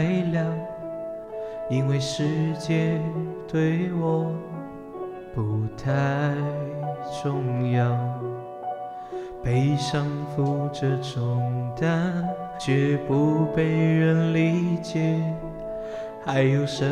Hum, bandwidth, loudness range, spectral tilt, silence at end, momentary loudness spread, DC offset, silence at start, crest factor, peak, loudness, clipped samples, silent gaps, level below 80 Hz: none; 10.5 kHz; 5 LU; -7.5 dB/octave; 0 s; 12 LU; under 0.1%; 0 s; 16 dB; -8 dBFS; -25 LUFS; under 0.1%; none; -52 dBFS